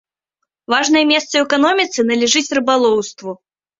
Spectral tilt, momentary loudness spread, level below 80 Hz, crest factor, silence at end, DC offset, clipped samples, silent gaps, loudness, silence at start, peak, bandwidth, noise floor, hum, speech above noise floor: -2 dB/octave; 14 LU; -60 dBFS; 16 dB; 0.45 s; under 0.1%; under 0.1%; none; -14 LUFS; 0.7 s; 0 dBFS; 7.8 kHz; -76 dBFS; none; 61 dB